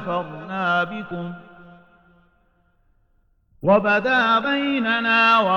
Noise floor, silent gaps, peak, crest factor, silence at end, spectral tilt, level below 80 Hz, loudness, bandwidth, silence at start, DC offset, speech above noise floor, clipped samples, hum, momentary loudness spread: -62 dBFS; none; -6 dBFS; 16 dB; 0 s; -6 dB/octave; -60 dBFS; -19 LUFS; 17 kHz; 0 s; under 0.1%; 42 dB; under 0.1%; none; 15 LU